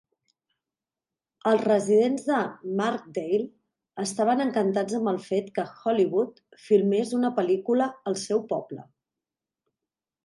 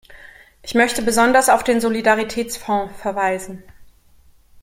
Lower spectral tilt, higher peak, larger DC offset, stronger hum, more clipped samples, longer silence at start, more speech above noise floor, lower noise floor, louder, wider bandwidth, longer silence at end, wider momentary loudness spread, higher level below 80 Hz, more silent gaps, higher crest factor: first, -5.5 dB/octave vs -3 dB/octave; second, -8 dBFS vs -2 dBFS; neither; neither; neither; first, 1.45 s vs 0.1 s; first, over 65 dB vs 33 dB; first, under -90 dBFS vs -51 dBFS; second, -26 LUFS vs -18 LUFS; second, 11.5 kHz vs 16.5 kHz; first, 1.4 s vs 0.8 s; second, 10 LU vs 13 LU; second, -78 dBFS vs -48 dBFS; neither; about the same, 18 dB vs 18 dB